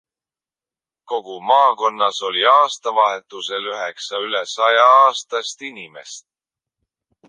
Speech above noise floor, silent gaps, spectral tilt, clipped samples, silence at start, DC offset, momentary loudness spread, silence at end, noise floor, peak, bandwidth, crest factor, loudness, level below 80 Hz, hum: over 72 dB; none; -0.5 dB/octave; under 0.1%; 1.1 s; under 0.1%; 19 LU; 1.1 s; under -90 dBFS; -2 dBFS; 10 kHz; 18 dB; -17 LUFS; -78 dBFS; none